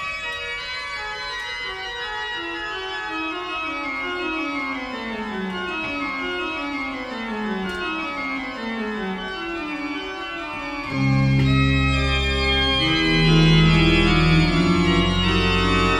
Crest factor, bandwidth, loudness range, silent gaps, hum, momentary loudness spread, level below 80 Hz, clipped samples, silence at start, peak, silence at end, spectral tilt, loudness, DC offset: 16 dB; 10 kHz; 10 LU; none; none; 11 LU; -32 dBFS; under 0.1%; 0 s; -6 dBFS; 0 s; -5.5 dB/octave; -22 LUFS; under 0.1%